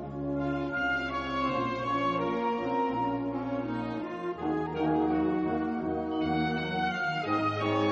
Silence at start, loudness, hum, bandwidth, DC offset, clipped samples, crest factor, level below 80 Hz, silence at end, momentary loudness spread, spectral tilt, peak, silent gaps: 0 s; -30 LUFS; none; 7.4 kHz; under 0.1%; under 0.1%; 14 dB; -54 dBFS; 0 s; 5 LU; -7 dB/octave; -16 dBFS; none